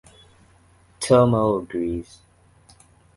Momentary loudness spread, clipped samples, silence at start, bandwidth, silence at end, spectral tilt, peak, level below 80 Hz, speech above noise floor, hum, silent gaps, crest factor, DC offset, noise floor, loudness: 15 LU; under 0.1%; 1 s; 11.5 kHz; 1.15 s; -6.5 dB/octave; -2 dBFS; -48 dBFS; 36 dB; none; none; 22 dB; under 0.1%; -55 dBFS; -21 LUFS